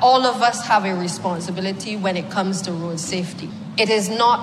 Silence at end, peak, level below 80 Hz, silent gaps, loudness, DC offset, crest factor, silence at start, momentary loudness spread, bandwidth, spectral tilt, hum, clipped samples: 0 s; -6 dBFS; -66 dBFS; none; -21 LUFS; under 0.1%; 14 dB; 0 s; 9 LU; 14 kHz; -4 dB/octave; none; under 0.1%